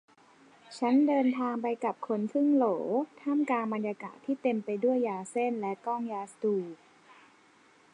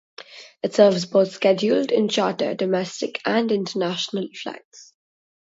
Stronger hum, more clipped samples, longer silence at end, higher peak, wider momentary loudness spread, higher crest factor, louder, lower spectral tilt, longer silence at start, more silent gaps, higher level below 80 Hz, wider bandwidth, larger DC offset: neither; neither; first, 1.2 s vs 0.65 s; second, -16 dBFS vs -2 dBFS; second, 9 LU vs 17 LU; second, 14 dB vs 20 dB; second, -30 LUFS vs -21 LUFS; first, -6.5 dB/octave vs -5 dB/octave; first, 0.7 s vs 0.3 s; second, none vs 4.65-4.71 s; second, -88 dBFS vs -72 dBFS; first, 10.5 kHz vs 8 kHz; neither